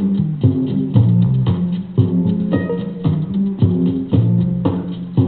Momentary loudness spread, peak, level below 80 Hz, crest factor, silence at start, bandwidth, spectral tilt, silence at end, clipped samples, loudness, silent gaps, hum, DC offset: 6 LU; 0 dBFS; -42 dBFS; 16 dB; 0 s; 4.3 kHz; -14 dB/octave; 0 s; under 0.1%; -17 LUFS; none; none; under 0.1%